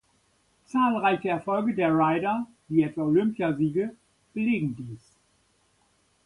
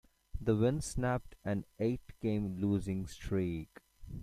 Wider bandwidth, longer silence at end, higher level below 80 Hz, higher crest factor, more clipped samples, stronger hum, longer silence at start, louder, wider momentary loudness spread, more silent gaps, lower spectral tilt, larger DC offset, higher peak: second, 11 kHz vs 14.5 kHz; first, 1.3 s vs 0 s; second, -64 dBFS vs -50 dBFS; about the same, 18 dB vs 18 dB; neither; neither; first, 0.75 s vs 0.35 s; first, -26 LUFS vs -36 LUFS; about the same, 11 LU vs 10 LU; neither; about the same, -8 dB/octave vs -7 dB/octave; neither; first, -10 dBFS vs -16 dBFS